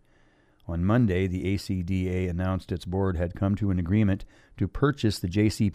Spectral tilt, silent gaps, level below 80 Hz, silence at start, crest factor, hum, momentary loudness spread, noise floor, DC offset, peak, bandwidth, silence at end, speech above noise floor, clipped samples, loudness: -7.5 dB/octave; none; -44 dBFS; 0.7 s; 18 dB; none; 8 LU; -61 dBFS; under 0.1%; -8 dBFS; 14 kHz; 0 s; 35 dB; under 0.1%; -27 LUFS